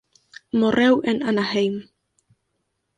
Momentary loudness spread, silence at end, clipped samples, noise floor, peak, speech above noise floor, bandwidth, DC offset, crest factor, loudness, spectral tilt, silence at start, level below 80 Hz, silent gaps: 8 LU; 1.15 s; under 0.1%; -74 dBFS; -6 dBFS; 55 dB; 9.6 kHz; under 0.1%; 16 dB; -20 LUFS; -6 dB/octave; 0.55 s; -60 dBFS; none